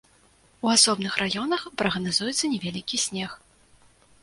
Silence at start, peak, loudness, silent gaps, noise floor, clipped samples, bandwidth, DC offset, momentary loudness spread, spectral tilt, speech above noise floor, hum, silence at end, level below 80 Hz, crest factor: 0.65 s; -2 dBFS; -24 LUFS; none; -59 dBFS; under 0.1%; 11.5 kHz; under 0.1%; 11 LU; -2.5 dB/octave; 34 dB; none; 0.85 s; -60 dBFS; 24 dB